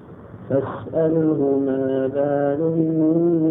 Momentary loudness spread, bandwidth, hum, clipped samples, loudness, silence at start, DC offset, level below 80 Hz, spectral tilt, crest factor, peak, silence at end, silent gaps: 6 LU; 3.6 kHz; none; under 0.1%; -20 LUFS; 0 s; under 0.1%; -58 dBFS; -12.5 dB/octave; 12 dB; -6 dBFS; 0 s; none